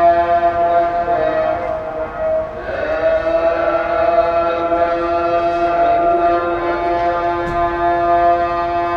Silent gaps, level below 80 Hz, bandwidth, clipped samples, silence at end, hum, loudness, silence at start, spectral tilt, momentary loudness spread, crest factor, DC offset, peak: none; -38 dBFS; 6.4 kHz; under 0.1%; 0 s; none; -16 LUFS; 0 s; -7 dB/octave; 6 LU; 12 dB; under 0.1%; -4 dBFS